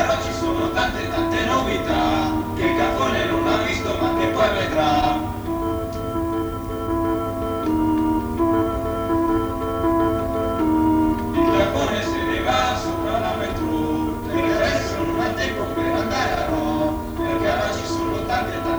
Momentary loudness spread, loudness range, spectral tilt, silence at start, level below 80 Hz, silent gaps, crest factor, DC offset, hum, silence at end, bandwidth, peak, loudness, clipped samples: 5 LU; 2 LU; -5.5 dB/octave; 0 s; -36 dBFS; none; 16 dB; under 0.1%; none; 0 s; over 20 kHz; -6 dBFS; -21 LUFS; under 0.1%